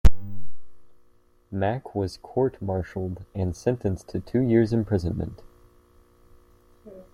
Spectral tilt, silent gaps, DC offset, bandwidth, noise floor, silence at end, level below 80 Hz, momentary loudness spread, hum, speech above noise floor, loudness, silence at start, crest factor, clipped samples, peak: -8 dB/octave; none; under 0.1%; 16.5 kHz; -59 dBFS; 0.1 s; -34 dBFS; 21 LU; none; 33 dB; -27 LUFS; 0.05 s; 22 dB; under 0.1%; -2 dBFS